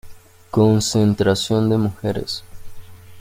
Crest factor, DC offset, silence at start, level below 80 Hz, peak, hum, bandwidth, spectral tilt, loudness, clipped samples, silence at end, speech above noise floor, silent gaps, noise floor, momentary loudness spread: 16 dB; under 0.1%; 0.05 s; -46 dBFS; -4 dBFS; none; 16 kHz; -6 dB/octave; -19 LUFS; under 0.1%; 0 s; 21 dB; none; -39 dBFS; 10 LU